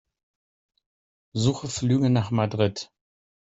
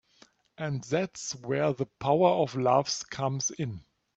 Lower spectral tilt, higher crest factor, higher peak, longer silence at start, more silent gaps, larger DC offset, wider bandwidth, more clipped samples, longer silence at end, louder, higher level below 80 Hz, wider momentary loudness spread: first, -6 dB/octave vs -4.5 dB/octave; about the same, 20 dB vs 20 dB; about the same, -8 dBFS vs -10 dBFS; first, 1.35 s vs 0.6 s; neither; neither; about the same, 8.2 kHz vs 8.4 kHz; neither; first, 0.6 s vs 0.35 s; first, -24 LUFS vs -29 LUFS; first, -58 dBFS vs -66 dBFS; about the same, 14 LU vs 12 LU